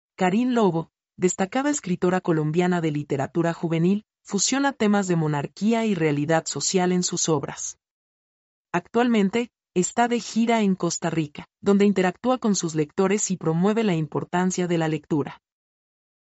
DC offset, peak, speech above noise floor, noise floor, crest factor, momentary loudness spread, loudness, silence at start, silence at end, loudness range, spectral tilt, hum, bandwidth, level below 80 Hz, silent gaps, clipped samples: under 0.1%; -8 dBFS; over 67 dB; under -90 dBFS; 16 dB; 7 LU; -23 LUFS; 0.2 s; 0.9 s; 2 LU; -5.5 dB/octave; none; 8 kHz; -66 dBFS; 7.91-8.65 s; under 0.1%